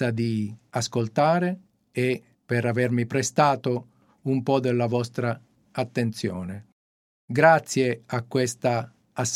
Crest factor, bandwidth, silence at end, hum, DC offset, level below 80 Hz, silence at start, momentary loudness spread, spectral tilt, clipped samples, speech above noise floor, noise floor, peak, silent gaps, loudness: 22 dB; 15 kHz; 0 s; none; under 0.1%; -68 dBFS; 0 s; 13 LU; -5.5 dB/octave; under 0.1%; over 66 dB; under -90 dBFS; -2 dBFS; 6.72-7.28 s; -25 LUFS